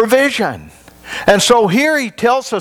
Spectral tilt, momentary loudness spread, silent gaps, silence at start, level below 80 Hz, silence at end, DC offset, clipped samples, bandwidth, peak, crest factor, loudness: -3.5 dB/octave; 11 LU; none; 0 s; -46 dBFS; 0 s; under 0.1%; under 0.1%; over 20 kHz; 0 dBFS; 14 dB; -13 LUFS